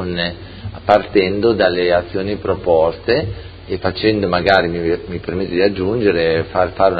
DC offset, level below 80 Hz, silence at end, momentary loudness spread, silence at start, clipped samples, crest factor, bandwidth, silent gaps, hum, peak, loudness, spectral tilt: under 0.1%; -36 dBFS; 0 s; 10 LU; 0 s; under 0.1%; 16 dB; 6.6 kHz; none; none; 0 dBFS; -17 LUFS; -8 dB/octave